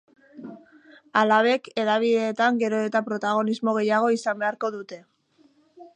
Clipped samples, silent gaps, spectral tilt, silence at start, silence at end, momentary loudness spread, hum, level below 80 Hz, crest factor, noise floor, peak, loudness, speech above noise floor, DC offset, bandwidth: under 0.1%; none; -5 dB/octave; 0.35 s; 0.1 s; 22 LU; none; -80 dBFS; 20 dB; -61 dBFS; -6 dBFS; -23 LUFS; 38 dB; under 0.1%; 10 kHz